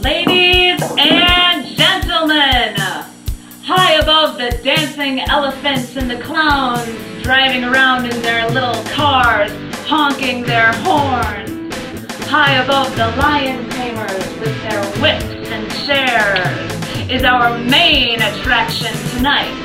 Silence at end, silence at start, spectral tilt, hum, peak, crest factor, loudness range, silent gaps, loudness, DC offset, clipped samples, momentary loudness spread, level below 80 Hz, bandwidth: 0 s; 0 s; -4 dB/octave; none; 0 dBFS; 14 dB; 4 LU; none; -13 LUFS; under 0.1%; under 0.1%; 12 LU; -32 dBFS; 16.5 kHz